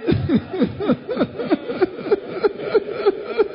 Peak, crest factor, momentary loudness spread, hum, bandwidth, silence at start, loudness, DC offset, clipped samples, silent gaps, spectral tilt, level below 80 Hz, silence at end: -4 dBFS; 16 dB; 4 LU; none; 5.4 kHz; 0 s; -21 LUFS; under 0.1%; under 0.1%; none; -12 dB/octave; -44 dBFS; 0 s